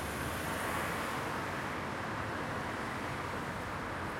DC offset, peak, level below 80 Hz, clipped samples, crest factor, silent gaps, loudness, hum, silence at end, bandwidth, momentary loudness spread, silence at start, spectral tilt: under 0.1%; -24 dBFS; -56 dBFS; under 0.1%; 14 dB; none; -37 LUFS; none; 0 s; 16.5 kHz; 3 LU; 0 s; -4.5 dB/octave